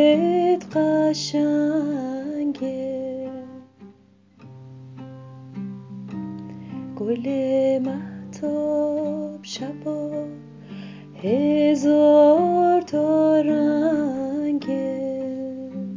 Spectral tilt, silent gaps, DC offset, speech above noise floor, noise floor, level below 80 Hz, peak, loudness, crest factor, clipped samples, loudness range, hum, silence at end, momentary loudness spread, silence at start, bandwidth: -6.5 dB/octave; none; under 0.1%; 33 dB; -54 dBFS; -66 dBFS; -6 dBFS; -22 LUFS; 16 dB; under 0.1%; 17 LU; none; 0 s; 20 LU; 0 s; 7.6 kHz